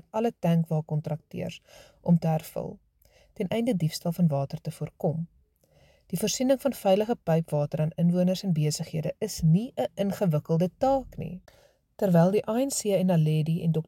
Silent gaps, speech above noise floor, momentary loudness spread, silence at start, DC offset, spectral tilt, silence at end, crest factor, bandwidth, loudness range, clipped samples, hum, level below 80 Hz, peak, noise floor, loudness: none; 36 dB; 12 LU; 0.15 s; under 0.1%; -6.5 dB/octave; 0.05 s; 16 dB; 16.5 kHz; 4 LU; under 0.1%; none; -56 dBFS; -10 dBFS; -62 dBFS; -27 LUFS